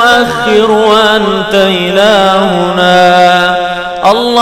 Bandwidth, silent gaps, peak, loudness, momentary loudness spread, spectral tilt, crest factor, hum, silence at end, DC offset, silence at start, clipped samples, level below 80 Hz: 17 kHz; none; 0 dBFS; -7 LUFS; 5 LU; -4.5 dB/octave; 8 dB; none; 0 s; under 0.1%; 0 s; 0.8%; -40 dBFS